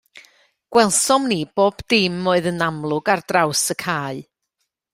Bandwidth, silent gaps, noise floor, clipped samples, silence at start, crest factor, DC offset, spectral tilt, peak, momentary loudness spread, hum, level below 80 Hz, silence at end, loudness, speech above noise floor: 16 kHz; none; -75 dBFS; under 0.1%; 0.15 s; 18 dB; under 0.1%; -3.5 dB/octave; -2 dBFS; 8 LU; none; -56 dBFS; 0.7 s; -19 LUFS; 56 dB